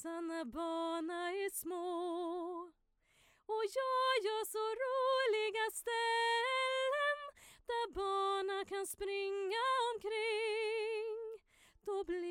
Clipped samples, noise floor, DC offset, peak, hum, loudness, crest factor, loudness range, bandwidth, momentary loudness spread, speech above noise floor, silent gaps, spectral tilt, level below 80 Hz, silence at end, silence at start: under 0.1%; -72 dBFS; under 0.1%; -24 dBFS; none; -37 LUFS; 14 dB; 6 LU; 17 kHz; 10 LU; 35 dB; none; -1.5 dB/octave; -70 dBFS; 0 s; 0 s